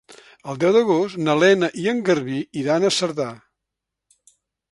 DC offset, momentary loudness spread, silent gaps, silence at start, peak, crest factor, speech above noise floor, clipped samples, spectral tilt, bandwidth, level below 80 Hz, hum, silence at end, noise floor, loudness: under 0.1%; 12 LU; none; 0.1 s; -2 dBFS; 18 dB; 64 dB; under 0.1%; -5 dB/octave; 11.5 kHz; -66 dBFS; none; 1.35 s; -83 dBFS; -20 LUFS